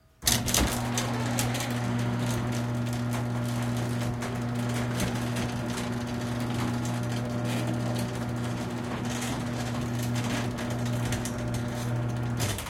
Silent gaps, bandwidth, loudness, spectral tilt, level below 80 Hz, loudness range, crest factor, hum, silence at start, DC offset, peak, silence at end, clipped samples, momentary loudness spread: none; 17 kHz; -30 LUFS; -4.5 dB/octave; -46 dBFS; 2 LU; 22 dB; none; 0.2 s; under 0.1%; -6 dBFS; 0 s; under 0.1%; 4 LU